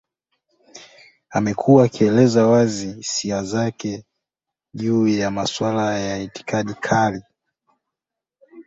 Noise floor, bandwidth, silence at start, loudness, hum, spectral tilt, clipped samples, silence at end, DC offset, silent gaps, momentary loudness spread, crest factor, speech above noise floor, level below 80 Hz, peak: -86 dBFS; 8 kHz; 0.75 s; -19 LUFS; none; -5.5 dB/octave; under 0.1%; 0.05 s; under 0.1%; none; 13 LU; 18 dB; 67 dB; -54 dBFS; -2 dBFS